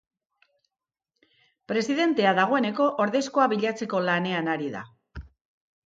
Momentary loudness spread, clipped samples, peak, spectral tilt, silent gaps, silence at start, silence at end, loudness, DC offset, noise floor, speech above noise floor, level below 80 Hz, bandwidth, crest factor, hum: 19 LU; under 0.1%; -8 dBFS; -5 dB/octave; none; 1.7 s; 0.6 s; -24 LUFS; under 0.1%; -89 dBFS; 65 dB; -56 dBFS; 9 kHz; 20 dB; none